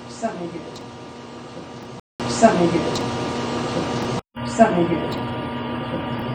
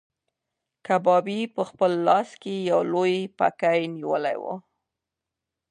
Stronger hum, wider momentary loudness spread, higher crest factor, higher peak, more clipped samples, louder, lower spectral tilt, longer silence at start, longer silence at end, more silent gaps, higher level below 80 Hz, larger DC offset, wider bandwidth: first, 60 Hz at -40 dBFS vs none; first, 20 LU vs 11 LU; about the same, 22 dB vs 18 dB; first, 0 dBFS vs -6 dBFS; neither; about the same, -22 LUFS vs -24 LUFS; about the same, -5.5 dB/octave vs -6 dB/octave; second, 0 s vs 0.9 s; second, 0 s vs 1.1 s; first, 2.00-2.19 s vs none; first, -50 dBFS vs -78 dBFS; neither; first, over 20 kHz vs 10.5 kHz